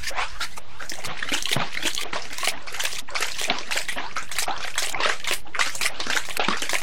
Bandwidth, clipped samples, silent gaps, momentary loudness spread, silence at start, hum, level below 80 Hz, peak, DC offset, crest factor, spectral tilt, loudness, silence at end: 17 kHz; under 0.1%; none; 7 LU; 0 s; none; -50 dBFS; -6 dBFS; 7%; 24 dB; -1 dB/octave; -26 LUFS; 0 s